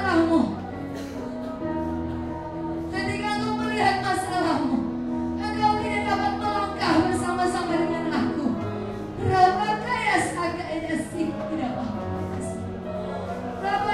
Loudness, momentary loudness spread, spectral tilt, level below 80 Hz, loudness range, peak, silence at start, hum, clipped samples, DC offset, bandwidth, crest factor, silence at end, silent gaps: -26 LUFS; 10 LU; -5.5 dB/octave; -46 dBFS; 5 LU; -6 dBFS; 0 s; none; under 0.1%; under 0.1%; 13 kHz; 20 dB; 0 s; none